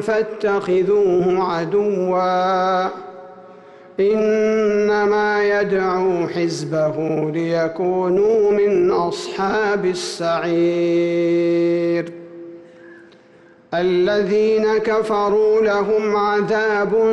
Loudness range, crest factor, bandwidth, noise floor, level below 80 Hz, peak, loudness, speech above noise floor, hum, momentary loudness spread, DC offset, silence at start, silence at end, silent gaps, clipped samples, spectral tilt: 3 LU; 8 dB; 11.5 kHz; -48 dBFS; -56 dBFS; -10 dBFS; -18 LUFS; 31 dB; none; 6 LU; under 0.1%; 0 s; 0 s; none; under 0.1%; -6 dB/octave